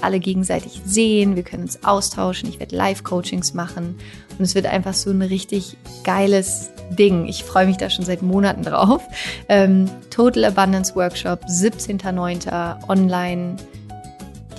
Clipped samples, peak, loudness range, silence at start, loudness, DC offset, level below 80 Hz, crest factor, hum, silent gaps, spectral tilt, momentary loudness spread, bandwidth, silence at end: under 0.1%; -2 dBFS; 5 LU; 0 s; -19 LUFS; under 0.1%; -44 dBFS; 16 dB; none; none; -5 dB/octave; 12 LU; 12.5 kHz; 0 s